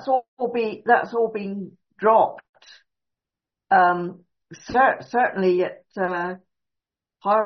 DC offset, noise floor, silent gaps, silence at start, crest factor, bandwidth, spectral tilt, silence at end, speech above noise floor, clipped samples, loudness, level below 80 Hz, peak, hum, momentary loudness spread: under 0.1%; -88 dBFS; 0.28-0.37 s, 2.49-2.53 s; 0 s; 18 dB; 6.4 kHz; -4 dB/octave; 0 s; 67 dB; under 0.1%; -22 LUFS; -64 dBFS; -4 dBFS; none; 14 LU